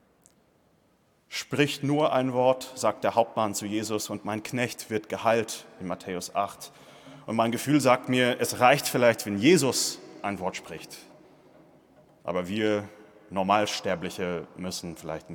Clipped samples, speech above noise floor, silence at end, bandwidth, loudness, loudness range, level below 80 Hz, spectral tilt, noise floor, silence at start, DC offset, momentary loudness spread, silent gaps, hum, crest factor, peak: under 0.1%; 39 dB; 0 s; 19 kHz; -27 LUFS; 7 LU; -70 dBFS; -4 dB/octave; -66 dBFS; 1.3 s; under 0.1%; 15 LU; none; none; 22 dB; -6 dBFS